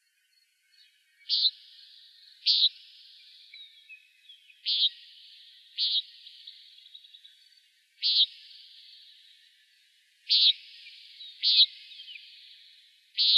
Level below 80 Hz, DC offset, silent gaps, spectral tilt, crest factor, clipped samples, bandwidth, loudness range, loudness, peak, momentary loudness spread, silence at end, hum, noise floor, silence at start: under -90 dBFS; under 0.1%; none; 9 dB/octave; 22 dB; under 0.1%; 13 kHz; 5 LU; -24 LUFS; -10 dBFS; 28 LU; 0 s; none; -70 dBFS; 1.3 s